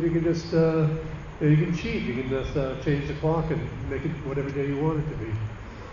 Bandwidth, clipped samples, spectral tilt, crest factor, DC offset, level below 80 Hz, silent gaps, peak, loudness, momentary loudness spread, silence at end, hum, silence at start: 7.2 kHz; under 0.1%; -8 dB/octave; 16 dB; under 0.1%; -40 dBFS; none; -10 dBFS; -27 LUFS; 9 LU; 0 s; none; 0 s